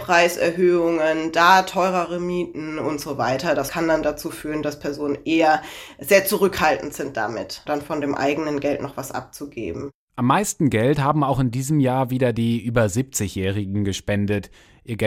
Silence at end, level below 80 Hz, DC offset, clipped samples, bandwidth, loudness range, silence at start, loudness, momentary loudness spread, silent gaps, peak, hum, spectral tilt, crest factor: 0 s; -48 dBFS; under 0.1%; under 0.1%; 16 kHz; 4 LU; 0 s; -21 LUFS; 12 LU; 9.94-10.08 s; 0 dBFS; none; -5 dB/octave; 20 dB